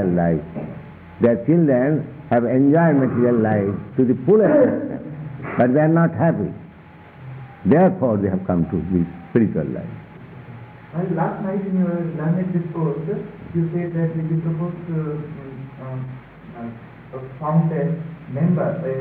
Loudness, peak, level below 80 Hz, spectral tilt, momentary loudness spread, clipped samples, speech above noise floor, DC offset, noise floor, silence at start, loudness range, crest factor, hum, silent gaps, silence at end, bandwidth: -20 LUFS; -4 dBFS; -50 dBFS; -13 dB/octave; 20 LU; under 0.1%; 24 dB; under 0.1%; -43 dBFS; 0 s; 9 LU; 16 dB; none; none; 0 s; 3.7 kHz